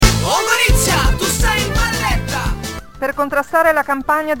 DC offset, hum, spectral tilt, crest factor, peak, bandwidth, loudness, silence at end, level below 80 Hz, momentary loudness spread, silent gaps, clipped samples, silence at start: 1%; none; -3.5 dB/octave; 16 dB; 0 dBFS; 17 kHz; -16 LUFS; 0 s; -22 dBFS; 10 LU; none; under 0.1%; 0 s